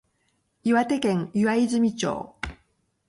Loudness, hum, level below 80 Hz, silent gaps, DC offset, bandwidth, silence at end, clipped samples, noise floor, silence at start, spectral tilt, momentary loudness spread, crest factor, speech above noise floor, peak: -24 LUFS; none; -52 dBFS; none; under 0.1%; 11.5 kHz; 0.55 s; under 0.1%; -71 dBFS; 0.65 s; -5.5 dB/octave; 13 LU; 14 dB; 48 dB; -10 dBFS